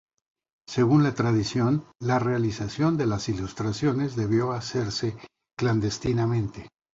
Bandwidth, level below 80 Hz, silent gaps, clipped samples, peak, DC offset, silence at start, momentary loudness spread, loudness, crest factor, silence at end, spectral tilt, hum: 8 kHz; -52 dBFS; none; under 0.1%; -8 dBFS; under 0.1%; 0.7 s; 9 LU; -26 LUFS; 18 dB; 0.25 s; -6.5 dB/octave; none